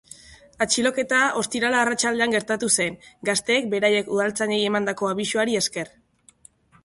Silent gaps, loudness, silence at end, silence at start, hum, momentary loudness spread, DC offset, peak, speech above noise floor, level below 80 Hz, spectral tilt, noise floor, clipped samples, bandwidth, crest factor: none; -22 LUFS; 0.95 s; 0.3 s; none; 5 LU; under 0.1%; -6 dBFS; 32 dB; -62 dBFS; -2.5 dB/octave; -55 dBFS; under 0.1%; 11.5 kHz; 18 dB